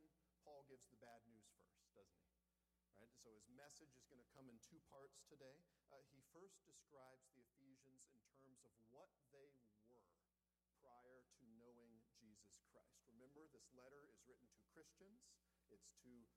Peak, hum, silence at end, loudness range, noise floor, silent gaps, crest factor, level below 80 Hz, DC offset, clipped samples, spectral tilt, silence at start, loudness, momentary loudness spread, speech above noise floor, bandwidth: -52 dBFS; none; 0 s; 1 LU; under -90 dBFS; none; 20 dB; under -90 dBFS; under 0.1%; under 0.1%; -3.5 dB/octave; 0 s; -68 LUFS; 3 LU; over 19 dB; 13 kHz